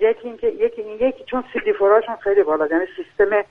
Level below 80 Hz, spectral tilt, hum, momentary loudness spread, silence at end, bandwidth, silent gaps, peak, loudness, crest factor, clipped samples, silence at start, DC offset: -50 dBFS; -7 dB/octave; none; 8 LU; 0.05 s; 3.8 kHz; none; -4 dBFS; -20 LUFS; 16 dB; under 0.1%; 0 s; under 0.1%